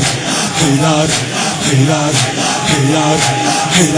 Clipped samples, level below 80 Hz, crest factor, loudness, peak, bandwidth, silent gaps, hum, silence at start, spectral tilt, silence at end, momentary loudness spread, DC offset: under 0.1%; -42 dBFS; 12 dB; -12 LUFS; 0 dBFS; 10.5 kHz; none; none; 0 s; -3.5 dB/octave; 0 s; 3 LU; under 0.1%